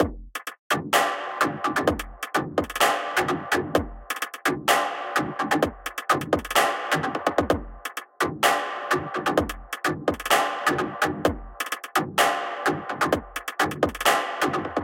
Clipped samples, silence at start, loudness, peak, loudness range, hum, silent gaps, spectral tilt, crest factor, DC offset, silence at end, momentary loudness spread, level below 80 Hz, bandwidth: under 0.1%; 0 s; -25 LUFS; -6 dBFS; 1 LU; none; 0.59-0.70 s; -3.5 dB/octave; 18 dB; under 0.1%; 0 s; 9 LU; -46 dBFS; 17 kHz